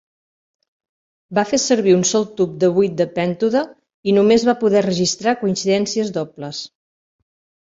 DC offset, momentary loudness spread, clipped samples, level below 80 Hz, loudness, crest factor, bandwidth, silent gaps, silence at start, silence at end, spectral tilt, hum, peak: under 0.1%; 13 LU; under 0.1%; -58 dBFS; -18 LUFS; 16 dB; 7.8 kHz; 3.94-4.03 s; 1.3 s; 1.05 s; -4.5 dB/octave; none; -2 dBFS